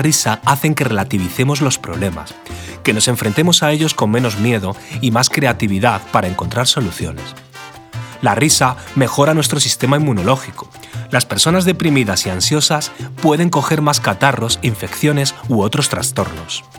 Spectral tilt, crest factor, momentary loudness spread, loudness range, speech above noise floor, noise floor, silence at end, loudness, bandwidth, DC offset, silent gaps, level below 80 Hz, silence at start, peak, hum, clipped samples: -4 dB/octave; 16 dB; 13 LU; 2 LU; 20 dB; -36 dBFS; 0 s; -15 LUFS; over 20 kHz; under 0.1%; none; -44 dBFS; 0 s; 0 dBFS; none; under 0.1%